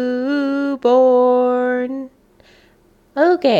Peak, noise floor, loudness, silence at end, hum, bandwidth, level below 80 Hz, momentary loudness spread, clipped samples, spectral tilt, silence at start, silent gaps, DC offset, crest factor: -4 dBFS; -53 dBFS; -16 LUFS; 0 s; none; 7.2 kHz; -62 dBFS; 15 LU; under 0.1%; -6 dB/octave; 0 s; none; under 0.1%; 14 dB